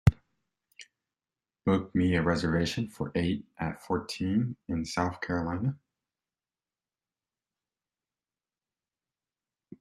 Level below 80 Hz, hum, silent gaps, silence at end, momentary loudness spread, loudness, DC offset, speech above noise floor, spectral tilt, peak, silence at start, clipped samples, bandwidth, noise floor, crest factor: -50 dBFS; none; none; 4.05 s; 7 LU; -30 LUFS; under 0.1%; over 60 dB; -6.5 dB/octave; -6 dBFS; 0.05 s; under 0.1%; 13 kHz; under -90 dBFS; 26 dB